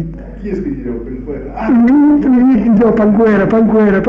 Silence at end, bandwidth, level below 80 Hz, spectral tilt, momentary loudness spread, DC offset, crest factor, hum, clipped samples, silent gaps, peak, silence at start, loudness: 0 s; 5.4 kHz; -32 dBFS; -10 dB/octave; 15 LU; under 0.1%; 8 dB; none; under 0.1%; none; -2 dBFS; 0 s; -10 LUFS